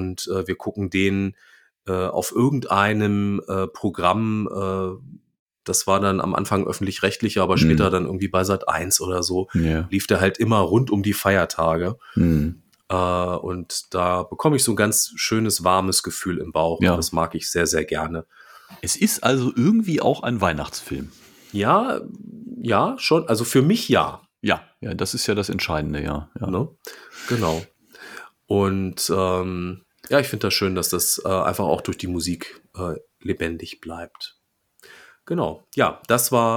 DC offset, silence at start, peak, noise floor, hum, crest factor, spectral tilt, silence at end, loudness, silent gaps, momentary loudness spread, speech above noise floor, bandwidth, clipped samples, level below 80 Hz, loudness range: under 0.1%; 0 s; -2 dBFS; -56 dBFS; none; 20 dB; -4.5 dB/octave; 0 s; -22 LUFS; 5.39-5.46 s; 12 LU; 34 dB; 19 kHz; under 0.1%; -44 dBFS; 5 LU